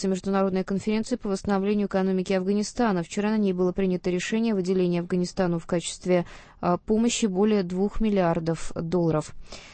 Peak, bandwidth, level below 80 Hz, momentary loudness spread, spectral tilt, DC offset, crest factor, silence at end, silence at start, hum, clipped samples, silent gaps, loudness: -10 dBFS; 8.8 kHz; -44 dBFS; 5 LU; -6 dB/octave; under 0.1%; 16 dB; 0 s; 0 s; none; under 0.1%; none; -25 LUFS